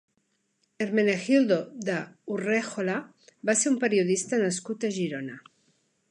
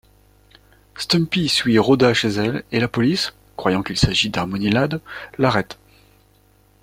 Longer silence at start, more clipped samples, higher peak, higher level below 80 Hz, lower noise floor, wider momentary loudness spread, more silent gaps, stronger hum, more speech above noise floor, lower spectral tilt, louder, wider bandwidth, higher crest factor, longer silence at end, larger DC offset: second, 0.8 s vs 0.95 s; neither; second, -10 dBFS vs -2 dBFS; second, -78 dBFS vs -42 dBFS; first, -74 dBFS vs -55 dBFS; about the same, 11 LU vs 9 LU; neither; second, none vs 50 Hz at -45 dBFS; first, 47 dB vs 37 dB; about the same, -4.5 dB/octave vs -5 dB/octave; second, -27 LUFS vs -19 LUFS; second, 11.5 kHz vs 16 kHz; about the same, 18 dB vs 20 dB; second, 0.7 s vs 1.1 s; neither